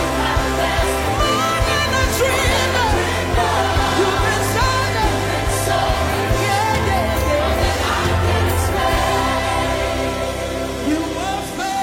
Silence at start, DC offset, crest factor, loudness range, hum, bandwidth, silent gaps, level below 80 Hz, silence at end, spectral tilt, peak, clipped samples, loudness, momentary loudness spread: 0 s; under 0.1%; 12 dB; 2 LU; none; 16.5 kHz; none; -26 dBFS; 0 s; -4 dB/octave; -6 dBFS; under 0.1%; -18 LUFS; 4 LU